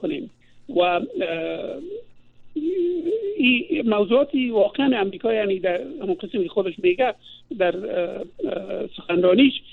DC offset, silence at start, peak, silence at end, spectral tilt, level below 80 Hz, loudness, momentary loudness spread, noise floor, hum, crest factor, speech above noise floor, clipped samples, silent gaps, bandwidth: under 0.1%; 0 s; -6 dBFS; 0 s; -7.5 dB/octave; -60 dBFS; -22 LUFS; 12 LU; -45 dBFS; none; 18 dB; 23 dB; under 0.1%; none; 4.3 kHz